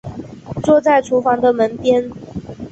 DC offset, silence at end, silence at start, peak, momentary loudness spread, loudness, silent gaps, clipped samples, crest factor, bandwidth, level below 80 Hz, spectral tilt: under 0.1%; 0.05 s; 0.05 s; -2 dBFS; 18 LU; -15 LUFS; none; under 0.1%; 14 dB; 8.2 kHz; -46 dBFS; -6.5 dB/octave